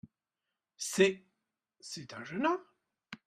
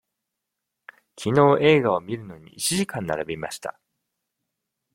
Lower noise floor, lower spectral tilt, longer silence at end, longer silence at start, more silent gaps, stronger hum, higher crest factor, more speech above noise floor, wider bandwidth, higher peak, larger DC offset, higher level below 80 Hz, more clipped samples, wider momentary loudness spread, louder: first, -89 dBFS vs -83 dBFS; about the same, -4 dB/octave vs -5 dB/octave; second, 0.1 s vs 1.25 s; second, 0.05 s vs 1.2 s; neither; neither; about the same, 26 dB vs 22 dB; second, 57 dB vs 61 dB; second, 14 kHz vs 16.5 kHz; second, -12 dBFS vs -2 dBFS; neither; second, -78 dBFS vs -60 dBFS; neither; first, 20 LU vs 17 LU; second, -33 LUFS vs -22 LUFS